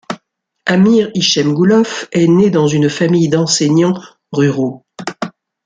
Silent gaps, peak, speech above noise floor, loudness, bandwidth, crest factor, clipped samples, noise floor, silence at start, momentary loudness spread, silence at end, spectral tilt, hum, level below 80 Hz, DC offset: none; 0 dBFS; 44 dB; -13 LUFS; 9.4 kHz; 12 dB; under 0.1%; -56 dBFS; 0.1 s; 16 LU; 0.35 s; -5 dB/octave; none; -54 dBFS; under 0.1%